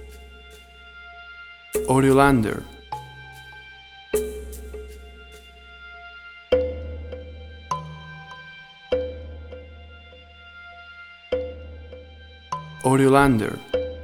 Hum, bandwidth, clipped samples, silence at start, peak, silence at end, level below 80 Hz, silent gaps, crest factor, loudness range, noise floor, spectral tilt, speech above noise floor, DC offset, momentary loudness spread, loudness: none; 19.5 kHz; under 0.1%; 0 s; -2 dBFS; 0 s; -44 dBFS; none; 24 dB; 12 LU; -46 dBFS; -6 dB/octave; 28 dB; under 0.1%; 27 LU; -23 LUFS